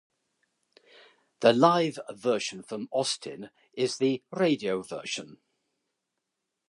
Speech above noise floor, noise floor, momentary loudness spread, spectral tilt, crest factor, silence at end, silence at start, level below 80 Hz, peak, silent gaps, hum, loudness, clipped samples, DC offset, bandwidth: 56 dB; -83 dBFS; 14 LU; -4.5 dB/octave; 24 dB; 1.4 s; 1.4 s; -78 dBFS; -6 dBFS; none; none; -28 LUFS; under 0.1%; under 0.1%; 11.5 kHz